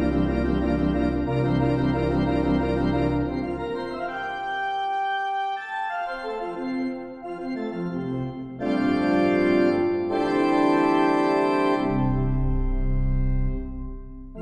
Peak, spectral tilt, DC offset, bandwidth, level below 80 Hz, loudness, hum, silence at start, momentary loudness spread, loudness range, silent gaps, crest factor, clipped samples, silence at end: -8 dBFS; -8 dB/octave; under 0.1%; 9.8 kHz; -32 dBFS; -24 LUFS; none; 0 s; 10 LU; 7 LU; none; 16 dB; under 0.1%; 0 s